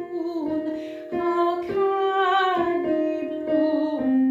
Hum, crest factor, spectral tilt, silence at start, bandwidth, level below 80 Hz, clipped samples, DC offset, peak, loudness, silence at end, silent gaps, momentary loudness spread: none; 12 dB; -6 dB/octave; 0 s; 7.6 kHz; -62 dBFS; under 0.1%; under 0.1%; -10 dBFS; -24 LUFS; 0 s; none; 8 LU